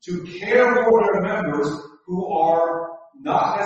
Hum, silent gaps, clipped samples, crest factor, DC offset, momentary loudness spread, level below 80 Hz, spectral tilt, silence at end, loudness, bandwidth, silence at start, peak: none; none; under 0.1%; 16 dB; under 0.1%; 14 LU; -60 dBFS; -6.5 dB/octave; 0 s; -20 LUFS; 8 kHz; 0.05 s; -4 dBFS